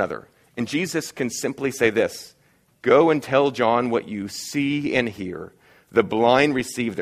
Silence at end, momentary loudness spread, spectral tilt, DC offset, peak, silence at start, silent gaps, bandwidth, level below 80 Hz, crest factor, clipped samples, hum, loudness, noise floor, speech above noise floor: 0 s; 15 LU; -4.5 dB/octave; under 0.1%; -2 dBFS; 0 s; none; 15.5 kHz; -58 dBFS; 20 dB; under 0.1%; none; -22 LUFS; -54 dBFS; 33 dB